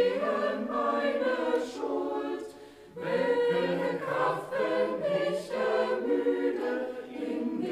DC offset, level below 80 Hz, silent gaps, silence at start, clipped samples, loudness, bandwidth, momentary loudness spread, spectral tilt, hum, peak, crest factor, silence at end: under 0.1%; -72 dBFS; none; 0 s; under 0.1%; -30 LUFS; 12.5 kHz; 9 LU; -6 dB/octave; none; -16 dBFS; 14 dB; 0 s